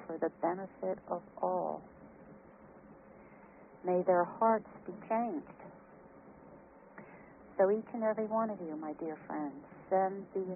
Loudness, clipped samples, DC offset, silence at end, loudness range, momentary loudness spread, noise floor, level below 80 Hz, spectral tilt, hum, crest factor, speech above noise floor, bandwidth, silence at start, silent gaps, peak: -35 LUFS; under 0.1%; under 0.1%; 0 s; 5 LU; 25 LU; -56 dBFS; -74 dBFS; -3 dB/octave; none; 20 dB; 22 dB; 2.9 kHz; 0 s; none; -16 dBFS